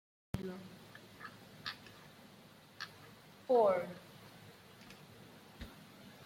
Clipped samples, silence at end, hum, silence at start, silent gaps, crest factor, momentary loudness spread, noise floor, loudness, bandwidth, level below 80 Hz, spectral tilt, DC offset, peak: under 0.1%; 0 s; none; 0.35 s; none; 22 dB; 25 LU; -60 dBFS; -37 LUFS; 16.5 kHz; -66 dBFS; -5.5 dB/octave; under 0.1%; -20 dBFS